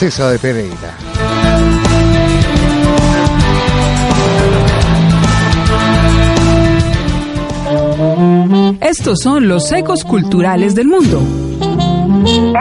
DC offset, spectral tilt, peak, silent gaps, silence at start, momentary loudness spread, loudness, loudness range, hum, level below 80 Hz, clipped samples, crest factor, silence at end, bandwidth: under 0.1%; -6 dB/octave; 0 dBFS; none; 0 s; 6 LU; -11 LUFS; 2 LU; none; -20 dBFS; under 0.1%; 10 dB; 0 s; 11.5 kHz